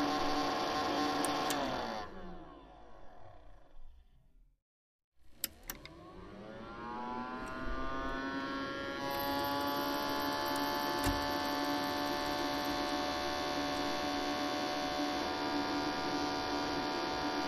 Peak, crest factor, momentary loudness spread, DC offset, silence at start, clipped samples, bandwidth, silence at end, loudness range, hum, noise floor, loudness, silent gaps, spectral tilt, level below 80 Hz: -16 dBFS; 22 dB; 13 LU; under 0.1%; 0 s; under 0.1%; 15.5 kHz; 0 s; 14 LU; none; -64 dBFS; -36 LUFS; 4.62-5.12 s; -3.5 dB/octave; -54 dBFS